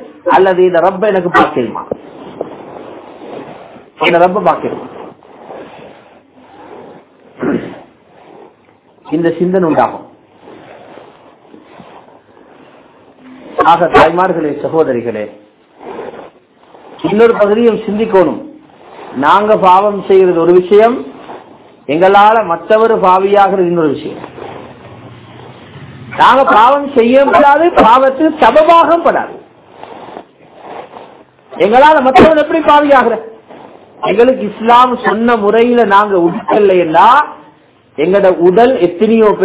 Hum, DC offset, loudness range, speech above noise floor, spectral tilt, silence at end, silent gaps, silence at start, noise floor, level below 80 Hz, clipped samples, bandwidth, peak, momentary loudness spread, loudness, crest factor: none; under 0.1%; 9 LU; 38 dB; -9.5 dB/octave; 0 s; none; 0 s; -46 dBFS; -46 dBFS; 2%; 4 kHz; 0 dBFS; 23 LU; -9 LUFS; 10 dB